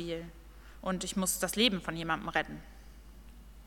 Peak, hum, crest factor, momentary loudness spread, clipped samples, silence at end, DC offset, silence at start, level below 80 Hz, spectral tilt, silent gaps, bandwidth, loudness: -12 dBFS; none; 24 dB; 14 LU; under 0.1%; 0 s; under 0.1%; 0 s; -52 dBFS; -3 dB/octave; none; 17.5 kHz; -32 LUFS